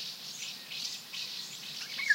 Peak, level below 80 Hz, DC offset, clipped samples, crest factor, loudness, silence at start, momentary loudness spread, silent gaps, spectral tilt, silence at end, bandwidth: -14 dBFS; under -90 dBFS; under 0.1%; under 0.1%; 22 dB; -38 LUFS; 0 s; 3 LU; none; 1 dB/octave; 0 s; 16 kHz